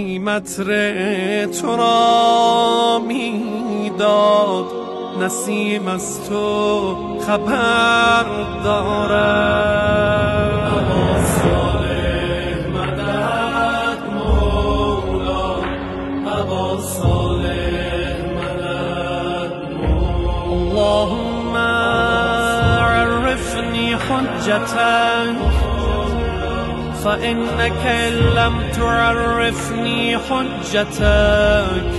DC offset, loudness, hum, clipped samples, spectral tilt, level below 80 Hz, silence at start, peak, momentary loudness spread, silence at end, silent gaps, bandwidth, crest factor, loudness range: under 0.1%; -17 LUFS; none; under 0.1%; -5 dB/octave; -28 dBFS; 0 s; -2 dBFS; 8 LU; 0 s; none; 12.5 kHz; 14 dB; 5 LU